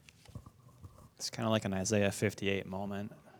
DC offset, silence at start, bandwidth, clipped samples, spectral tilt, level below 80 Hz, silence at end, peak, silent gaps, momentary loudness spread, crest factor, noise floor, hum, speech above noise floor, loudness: under 0.1%; 0.3 s; 20 kHz; under 0.1%; -4.5 dB/octave; -66 dBFS; 0 s; -14 dBFS; none; 22 LU; 22 dB; -56 dBFS; none; 22 dB; -35 LUFS